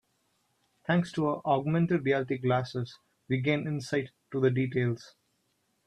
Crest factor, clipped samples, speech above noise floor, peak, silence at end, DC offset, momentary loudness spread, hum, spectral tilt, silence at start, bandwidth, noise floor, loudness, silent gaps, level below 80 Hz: 18 dB; under 0.1%; 46 dB; -12 dBFS; 0.8 s; under 0.1%; 10 LU; none; -7.5 dB/octave; 0.9 s; 10.5 kHz; -75 dBFS; -30 LUFS; none; -68 dBFS